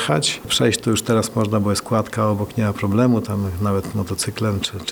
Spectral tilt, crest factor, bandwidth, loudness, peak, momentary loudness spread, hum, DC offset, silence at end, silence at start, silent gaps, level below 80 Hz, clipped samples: -5 dB/octave; 16 dB; over 20 kHz; -20 LUFS; -4 dBFS; 5 LU; none; under 0.1%; 0 s; 0 s; none; -48 dBFS; under 0.1%